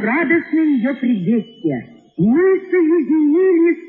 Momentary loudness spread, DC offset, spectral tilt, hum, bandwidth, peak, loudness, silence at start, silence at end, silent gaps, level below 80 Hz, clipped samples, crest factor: 9 LU; under 0.1%; -10.5 dB/octave; none; 4.1 kHz; -4 dBFS; -16 LUFS; 0 s; 0 s; none; -58 dBFS; under 0.1%; 12 dB